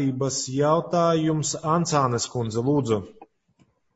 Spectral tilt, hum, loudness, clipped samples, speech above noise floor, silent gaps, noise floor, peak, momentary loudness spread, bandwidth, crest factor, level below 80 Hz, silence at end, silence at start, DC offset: -5.5 dB/octave; none; -23 LUFS; under 0.1%; 41 dB; none; -64 dBFS; -8 dBFS; 5 LU; 8 kHz; 16 dB; -58 dBFS; 0.7 s; 0 s; under 0.1%